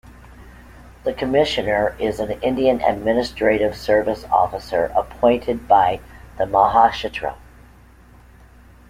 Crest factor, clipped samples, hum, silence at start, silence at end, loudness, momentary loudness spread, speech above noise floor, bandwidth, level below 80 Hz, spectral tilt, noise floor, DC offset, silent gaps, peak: 18 dB; under 0.1%; none; 0.3 s; 1.55 s; -19 LUFS; 10 LU; 28 dB; 16 kHz; -42 dBFS; -5.5 dB/octave; -47 dBFS; under 0.1%; none; -2 dBFS